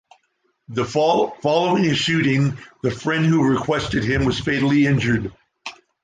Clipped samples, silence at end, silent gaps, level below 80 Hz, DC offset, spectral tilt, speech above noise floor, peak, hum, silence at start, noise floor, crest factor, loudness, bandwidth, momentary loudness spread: under 0.1%; 0.3 s; none; -44 dBFS; under 0.1%; -6 dB/octave; 49 dB; -4 dBFS; none; 0.7 s; -68 dBFS; 16 dB; -19 LUFS; 9.4 kHz; 12 LU